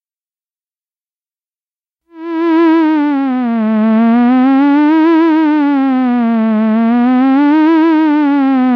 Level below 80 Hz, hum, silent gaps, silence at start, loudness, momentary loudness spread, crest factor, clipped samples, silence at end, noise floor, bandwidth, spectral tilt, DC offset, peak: -76 dBFS; none; none; 2.15 s; -10 LUFS; 4 LU; 6 dB; under 0.1%; 0 s; under -90 dBFS; 5.4 kHz; -8.5 dB/octave; under 0.1%; -6 dBFS